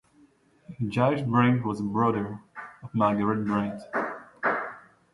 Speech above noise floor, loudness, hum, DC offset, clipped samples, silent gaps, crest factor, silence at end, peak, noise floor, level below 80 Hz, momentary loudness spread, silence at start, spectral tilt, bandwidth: 35 dB; -27 LUFS; none; under 0.1%; under 0.1%; none; 20 dB; 0.35 s; -8 dBFS; -60 dBFS; -62 dBFS; 13 LU; 0.7 s; -8.5 dB/octave; 11.5 kHz